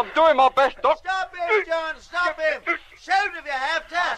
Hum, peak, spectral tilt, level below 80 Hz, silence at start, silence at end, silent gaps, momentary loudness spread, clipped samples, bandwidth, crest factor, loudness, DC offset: none; -6 dBFS; -2 dB/octave; -54 dBFS; 0 s; 0 s; none; 9 LU; under 0.1%; 10.5 kHz; 16 dB; -22 LUFS; under 0.1%